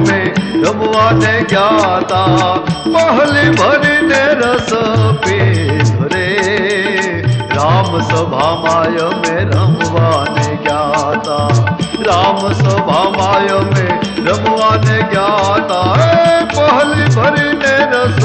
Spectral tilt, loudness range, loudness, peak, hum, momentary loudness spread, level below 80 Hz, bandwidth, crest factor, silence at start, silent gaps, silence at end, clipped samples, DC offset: -5.5 dB/octave; 2 LU; -11 LUFS; -2 dBFS; none; 5 LU; -40 dBFS; 8.8 kHz; 10 dB; 0 s; none; 0 s; under 0.1%; under 0.1%